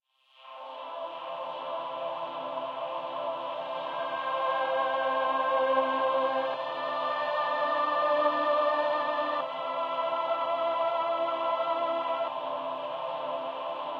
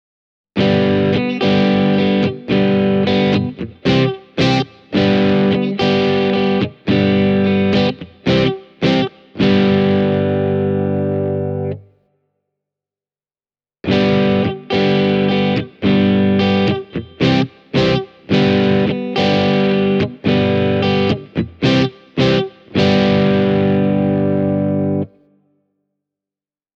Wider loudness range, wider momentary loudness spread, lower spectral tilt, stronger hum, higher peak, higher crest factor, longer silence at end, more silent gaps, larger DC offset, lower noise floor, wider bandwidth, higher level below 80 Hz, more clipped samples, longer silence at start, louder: first, 7 LU vs 4 LU; first, 9 LU vs 6 LU; second, -4.5 dB/octave vs -7.5 dB/octave; second, none vs 50 Hz at -45 dBFS; second, -14 dBFS vs -2 dBFS; about the same, 16 dB vs 14 dB; second, 0 s vs 1.7 s; neither; neither; second, -55 dBFS vs under -90 dBFS; about the same, 6.8 kHz vs 7 kHz; second, under -90 dBFS vs -46 dBFS; neither; second, 0.4 s vs 0.55 s; second, -30 LUFS vs -16 LUFS